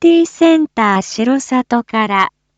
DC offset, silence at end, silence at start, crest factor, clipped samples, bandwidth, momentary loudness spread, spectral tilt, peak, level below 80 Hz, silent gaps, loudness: under 0.1%; 0.3 s; 0 s; 12 dB; under 0.1%; 8.2 kHz; 4 LU; -4.5 dB/octave; 0 dBFS; -56 dBFS; none; -14 LUFS